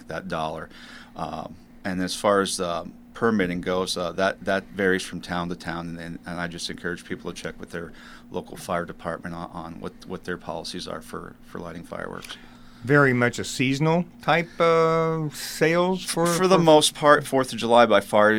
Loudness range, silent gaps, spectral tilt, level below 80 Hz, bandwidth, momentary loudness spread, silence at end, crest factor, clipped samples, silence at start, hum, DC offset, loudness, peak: 14 LU; none; -4.5 dB/octave; -52 dBFS; 17 kHz; 19 LU; 0 s; 24 dB; under 0.1%; 0 s; none; under 0.1%; -23 LUFS; 0 dBFS